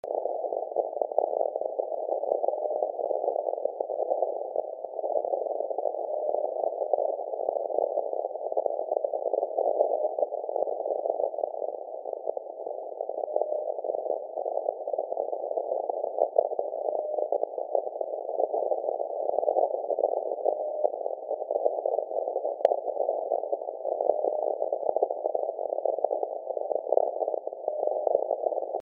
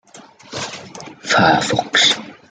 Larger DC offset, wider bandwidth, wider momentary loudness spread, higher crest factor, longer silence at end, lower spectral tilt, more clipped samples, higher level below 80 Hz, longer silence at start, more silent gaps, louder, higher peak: neither; second, 3 kHz vs 9.6 kHz; second, 6 LU vs 19 LU; first, 24 dB vs 18 dB; second, 0 s vs 0.2 s; second, 0.5 dB/octave vs -2.5 dB/octave; neither; second, under -90 dBFS vs -56 dBFS; about the same, 0.05 s vs 0.15 s; neither; second, -30 LUFS vs -14 LUFS; second, -6 dBFS vs -2 dBFS